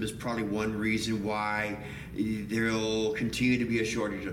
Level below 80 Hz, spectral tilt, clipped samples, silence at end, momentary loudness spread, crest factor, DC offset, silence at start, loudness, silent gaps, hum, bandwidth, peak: -52 dBFS; -5 dB/octave; under 0.1%; 0 s; 6 LU; 14 dB; under 0.1%; 0 s; -30 LUFS; none; none; 16.5 kHz; -16 dBFS